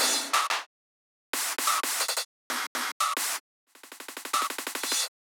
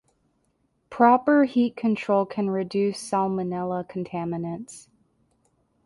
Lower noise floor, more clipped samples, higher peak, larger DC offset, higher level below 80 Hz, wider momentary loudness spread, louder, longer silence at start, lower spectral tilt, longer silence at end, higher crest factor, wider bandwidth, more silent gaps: first, under -90 dBFS vs -70 dBFS; neither; second, -10 dBFS vs -4 dBFS; neither; second, under -90 dBFS vs -66 dBFS; about the same, 12 LU vs 13 LU; second, -28 LUFS vs -24 LUFS; second, 0 s vs 0.9 s; second, 3 dB/octave vs -6.5 dB/octave; second, 0.25 s vs 1.05 s; about the same, 20 dB vs 20 dB; first, over 20 kHz vs 11.5 kHz; first, 0.66-1.33 s, 2.25-2.50 s, 2.67-2.75 s, 2.92-3.00 s, 3.40-3.67 s vs none